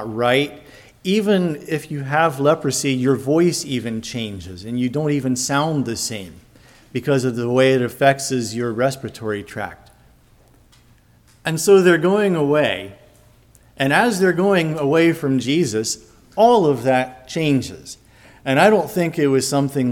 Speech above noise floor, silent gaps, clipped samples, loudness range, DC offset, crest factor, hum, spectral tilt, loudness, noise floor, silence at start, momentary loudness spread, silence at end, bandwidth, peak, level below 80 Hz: 35 dB; none; under 0.1%; 5 LU; under 0.1%; 18 dB; none; -5 dB/octave; -18 LUFS; -53 dBFS; 0 s; 14 LU; 0 s; 17.5 kHz; 0 dBFS; -54 dBFS